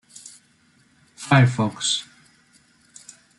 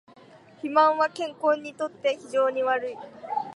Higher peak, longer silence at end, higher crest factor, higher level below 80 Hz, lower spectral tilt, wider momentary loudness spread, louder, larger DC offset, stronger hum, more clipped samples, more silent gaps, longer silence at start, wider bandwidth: about the same, -4 dBFS vs -6 dBFS; first, 1.35 s vs 0 s; about the same, 22 dB vs 20 dB; first, -62 dBFS vs -78 dBFS; about the same, -4.5 dB/octave vs -4 dB/octave; first, 27 LU vs 13 LU; first, -20 LUFS vs -25 LUFS; neither; neither; neither; neither; first, 1.2 s vs 0.65 s; about the same, 11.5 kHz vs 11.5 kHz